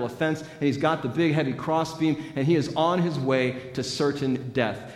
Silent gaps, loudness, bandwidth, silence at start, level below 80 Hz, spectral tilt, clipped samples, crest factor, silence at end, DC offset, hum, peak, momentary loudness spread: none; -25 LUFS; 13.5 kHz; 0 s; -62 dBFS; -6 dB/octave; under 0.1%; 18 dB; 0 s; under 0.1%; none; -8 dBFS; 4 LU